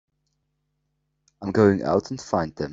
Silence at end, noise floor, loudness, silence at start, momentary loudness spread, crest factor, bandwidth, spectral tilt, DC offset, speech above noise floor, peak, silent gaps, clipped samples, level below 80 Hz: 0 s; -75 dBFS; -22 LUFS; 1.4 s; 8 LU; 20 dB; 7.8 kHz; -7 dB/octave; under 0.1%; 53 dB; -4 dBFS; none; under 0.1%; -56 dBFS